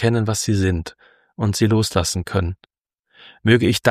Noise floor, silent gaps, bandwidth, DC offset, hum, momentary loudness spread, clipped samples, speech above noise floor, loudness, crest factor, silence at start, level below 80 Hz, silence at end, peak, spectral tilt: -60 dBFS; none; 15.5 kHz; under 0.1%; none; 11 LU; under 0.1%; 42 dB; -20 LUFS; 18 dB; 0 s; -40 dBFS; 0 s; -2 dBFS; -5 dB/octave